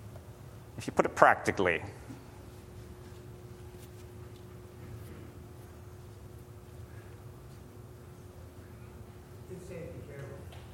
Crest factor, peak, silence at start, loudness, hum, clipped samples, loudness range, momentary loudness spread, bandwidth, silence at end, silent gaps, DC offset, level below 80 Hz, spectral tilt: 34 dB; -2 dBFS; 0 s; -30 LUFS; none; under 0.1%; 19 LU; 21 LU; 16.5 kHz; 0 s; none; under 0.1%; -56 dBFS; -5.5 dB/octave